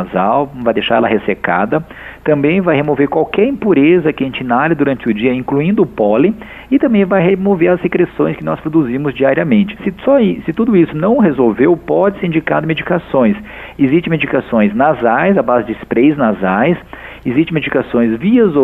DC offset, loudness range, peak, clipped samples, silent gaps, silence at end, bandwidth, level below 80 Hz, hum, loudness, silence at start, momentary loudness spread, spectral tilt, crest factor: under 0.1%; 1 LU; 0 dBFS; under 0.1%; none; 0 s; 4 kHz; -42 dBFS; none; -13 LUFS; 0 s; 6 LU; -9.5 dB/octave; 12 dB